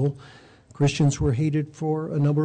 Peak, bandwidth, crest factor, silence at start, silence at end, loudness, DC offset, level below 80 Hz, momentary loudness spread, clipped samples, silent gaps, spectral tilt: -14 dBFS; 9.2 kHz; 10 dB; 0 s; 0 s; -24 LUFS; under 0.1%; -44 dBFS; 6 LU; under 0.1%; none; -7 dB/octave